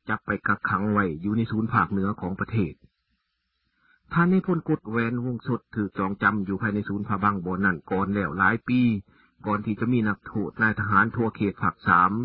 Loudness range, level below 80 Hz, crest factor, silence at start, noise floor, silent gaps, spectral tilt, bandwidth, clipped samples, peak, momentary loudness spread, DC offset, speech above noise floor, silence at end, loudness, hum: 3 LU; -50 dBFS; 22 dB; 0.05 s; -76 dBFS; none; -12 dB/octave; 5 kHz; under 0.1%; -4 dBFS; 8 LU; under 0.1%; 52 dB; 0 s; -25 LUFS; none